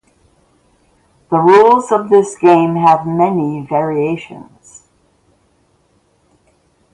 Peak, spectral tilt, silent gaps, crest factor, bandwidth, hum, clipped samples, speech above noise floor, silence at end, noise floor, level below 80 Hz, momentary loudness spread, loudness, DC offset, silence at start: 0 dBFS; -7 dB/octave; none; 14 dB; 11 kHz; none; under 0.1%; 45 dB; 2.5 s; -57 dBFS; -58 dBFS; 10 LU; -12 LUFS; under 0.1%; 1.3 s